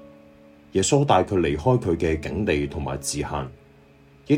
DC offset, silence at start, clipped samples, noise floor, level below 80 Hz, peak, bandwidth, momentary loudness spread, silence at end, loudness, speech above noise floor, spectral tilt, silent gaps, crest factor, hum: under 0.1%; 0 s; under 0.1%; -52 dBFS; -42 dBFS; -4 dBFS; 16 kHz; 9 LU; 0 s; -23 LUFS; 30 dB; -5.5 dB/octave; none; 20 dB; none